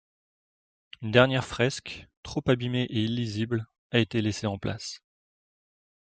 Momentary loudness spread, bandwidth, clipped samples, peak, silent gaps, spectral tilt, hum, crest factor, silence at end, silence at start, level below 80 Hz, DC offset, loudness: 16 LU; 9.2 kHz; under 0.1%; -4 dBFS; 2.17-2.23 s, 3.78-3.90 s; -5.5 dB/octave; none; 26 dB; 1.1 s; 1 s; -56 dBFS; under 0.1%; -27 LUFS